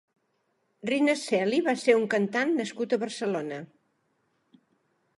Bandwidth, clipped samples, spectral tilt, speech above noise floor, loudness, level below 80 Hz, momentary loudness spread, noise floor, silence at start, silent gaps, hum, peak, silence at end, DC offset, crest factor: 11.5 kHz; under 0.1%; -4.5 dB/octave; 48 dB; -27 LUFS; -82 dBFS; 9 LU; -74 dBFS; 0.85 s; none; none; -6 dBFS; 1.5 s; under 0.1%; 22 dB